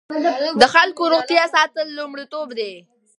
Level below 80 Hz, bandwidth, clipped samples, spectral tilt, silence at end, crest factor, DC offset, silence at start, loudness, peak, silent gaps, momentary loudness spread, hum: -62 dBFS; 11 kHz; under 0.1%; -2.5 dB/octave; 0.4 s; 18 dB; under 0.1%; 0.1 s; -17 LUFS; 0 dBFS; none; 16 LU; none